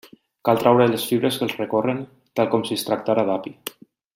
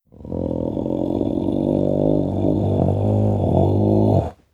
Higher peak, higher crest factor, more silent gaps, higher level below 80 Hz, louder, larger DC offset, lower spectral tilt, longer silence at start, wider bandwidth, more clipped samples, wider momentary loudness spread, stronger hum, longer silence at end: about the same, -2 dBFS vs -2 dBFS; about the same, 20 dB vs 16 dB; neither; second, -66 dBFS vs -38 dBFS; about the same, -21 LUFS vs -20 LUFS; neither; second, -5.5 dB/octave vs -11 dB/octave; first, 0.45 s vs 0.2 s; first, 16.5 kHz vs 4.4 kHz; neither; first, 13 LU vs 7 LU; neither; first, 0.45 s vs 0.2 s